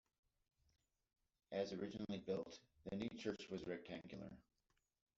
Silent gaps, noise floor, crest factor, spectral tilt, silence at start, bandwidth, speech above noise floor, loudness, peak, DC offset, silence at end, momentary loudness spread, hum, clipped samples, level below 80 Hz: none; -87 dBFS; 20 dB; -5 dB/octave; 1.5 s; 7.6 kHz; 38 dB; -49 LUFS; -30 dBFS; under 0.1%; 0.75 s; 10 LU; none; under 0.1%; -78 dBFS